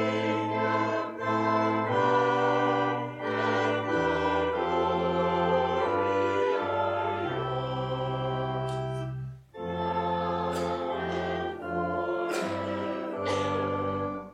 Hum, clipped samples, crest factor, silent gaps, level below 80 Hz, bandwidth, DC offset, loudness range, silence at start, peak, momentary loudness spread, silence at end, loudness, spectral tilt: none; under 0.1%; 16 dB; none; -56 dBFS; 13.5 kHz; under 0.1%; 5 LU; 0 s; -12 dBFS; 7 LU; 0 s; -28 LUFS; -6.5 dB/octave